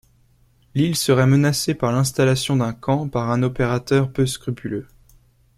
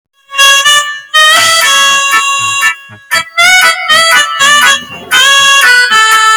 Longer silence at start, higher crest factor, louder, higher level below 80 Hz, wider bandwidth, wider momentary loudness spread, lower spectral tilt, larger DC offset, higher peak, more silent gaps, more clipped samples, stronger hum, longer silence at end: first, 0.75 s vs 0.3 s; first, 18 dB vs 8 dB; second, -20 LUFS vs -5 LUFS; about the same, -48 dBFS vs -52 dBFS; second, 15.5 kHz vs over 20 kHz; first, 11 LU vs 8 LU; first, -5.5 dB/octave vs 2 dB/octave; neither; second, -4 dBFS vs 0 dBFS; neither; second, under 0.1% vs 1%; neither; first, 0.75 s vs 0 s